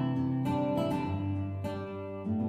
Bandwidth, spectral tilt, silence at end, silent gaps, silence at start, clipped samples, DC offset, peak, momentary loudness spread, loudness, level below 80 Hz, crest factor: 14 kHz; -8.5 dB/octave; 0 s; none; 0 s; under 0.1%; under 0.1%; -20 dBFS; 8 LU; -33 LUFS; -60 dBFS; 12 dB